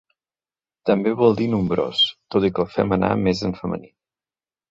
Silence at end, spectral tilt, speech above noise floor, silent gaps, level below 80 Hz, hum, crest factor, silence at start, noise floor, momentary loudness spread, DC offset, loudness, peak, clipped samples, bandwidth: 0.85 s; -6.5 dB/octave; over 70 dB; none; -48 dBFS; none; 18 dB; 0.85 s; under -90 dBFS; 9 LU; under 0.1%; -21 LUFS; -4 dBFS; under 0.1%; 7.8 kHz